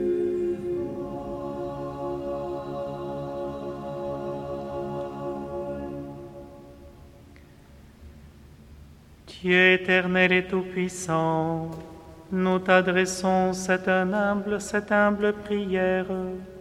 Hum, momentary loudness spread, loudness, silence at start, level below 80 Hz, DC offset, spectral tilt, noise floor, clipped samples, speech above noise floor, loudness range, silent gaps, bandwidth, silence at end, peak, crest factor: none; 14 LU; -26 LUFS; 0 s; -52 dBFS; under 0.1%; -5 dB/octave; -50 dBFS; under 0.1%; 26 dB; 13 LU; none; 13.5 kHz; 0 s; -4 dBFS; 22 dB